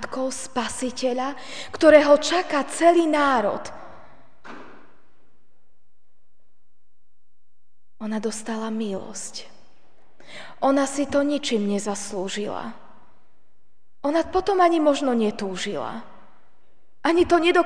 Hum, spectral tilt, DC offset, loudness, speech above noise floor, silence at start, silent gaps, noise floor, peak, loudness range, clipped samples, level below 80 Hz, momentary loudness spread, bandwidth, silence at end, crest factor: none; -4 dB/octave; 1%; -22 LUFS; 55 dB; 0 s; none; -77 dBFS; -2 dBFS; 13 LU; under 0.1%; -56 dBFS; 20 LU; 10 kHz; 0 s; 22 dB